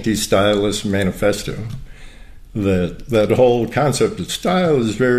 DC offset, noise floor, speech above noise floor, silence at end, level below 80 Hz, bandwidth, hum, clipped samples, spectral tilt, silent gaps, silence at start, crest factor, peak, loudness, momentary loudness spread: 0.3%; -37 dBFS; 20 dB; 0 s; -38 dBFS; 15 kHz; none; under 0.1%; -5 dB/octave; none; 0 s; 14 dB; -2 dBFS; -17 LUFS; 12 LU